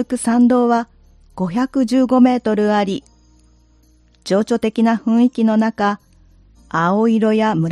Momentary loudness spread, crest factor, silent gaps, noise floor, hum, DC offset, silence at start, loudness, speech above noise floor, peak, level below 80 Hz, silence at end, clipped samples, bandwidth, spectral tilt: 10 LU; 14 dB; none; -52 dBFS; none; under 0.1%; 0 s; -16 LUFS; 37 dB; -2 dBFS; -52 dBFS; 0 s; under 0.1%; 11.5 kHz; -6.5 dB/octave